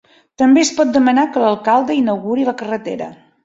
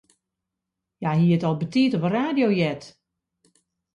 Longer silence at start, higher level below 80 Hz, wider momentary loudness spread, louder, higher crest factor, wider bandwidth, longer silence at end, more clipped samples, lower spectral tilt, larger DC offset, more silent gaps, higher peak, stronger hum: second, 0.4 s vs 1 s; first, -58 dBFS vs -64 dBFS; first, 11 LU vs 7 LU; first, -15 LUFS vs -22 LUFS; about the same, 14 dB vs 14 dB; second, 7.8 kHz vs 8.8 kHz; second, 0.3 s vs 1.05 s; neither; second, -4 dB/octave vs -8 dB/octave; neither; neither; first, -2 dBFS vs -10 dBFS; neither